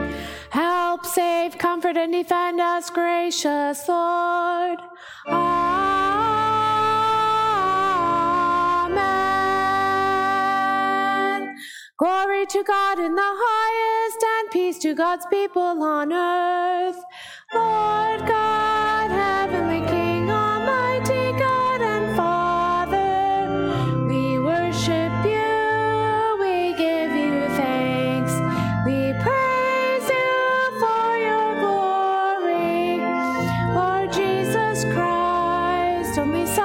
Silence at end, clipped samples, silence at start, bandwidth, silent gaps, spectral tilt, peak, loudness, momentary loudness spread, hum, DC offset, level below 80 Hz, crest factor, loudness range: 0 s; under 0.1%; 0 s; 17 kHz; none; -5 dB/octave; -6 dBFS; -21 LUFS; 3 LU; none; under 0.1%; -50 dBFS; 14 dB; 2 LU